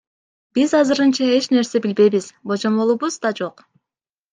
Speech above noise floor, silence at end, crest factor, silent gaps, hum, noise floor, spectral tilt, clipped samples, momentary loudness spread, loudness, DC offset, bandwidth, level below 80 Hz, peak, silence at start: 71 dB; 0.8 s; 16 dB; none; none; -89 dBFS; -4.5 dB/octave; under 0.1%; 9 LU; -18 LUFS; under 0.1%; 9.6 kHz; -66 dBFS; -4 dBFS; 0.55 s